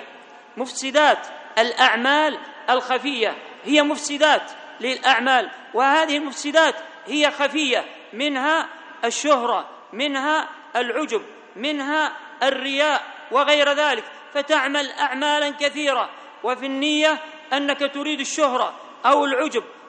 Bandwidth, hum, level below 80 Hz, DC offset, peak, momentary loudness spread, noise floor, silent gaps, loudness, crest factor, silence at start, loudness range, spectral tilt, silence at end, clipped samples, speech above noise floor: 9.6 kHz; none; -76 dBFS; under 0.1%; 0 dBFS; 10 LU; -44 dBFS; none; -21 LUFS; 20 dB; 0 s; 3 LU; -1 dB/octave; 0 s; under 0.1%; 24 dB